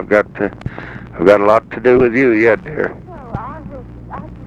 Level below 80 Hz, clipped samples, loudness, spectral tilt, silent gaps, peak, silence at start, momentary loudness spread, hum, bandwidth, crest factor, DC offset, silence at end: -38 dBFS; under 0.1%; -13 LUFS; -8 dB/octave; none; 0 dBFS; 0 s; 20 LU; none; 8.4 kHz; 14 dB; under 0.1%; 0 s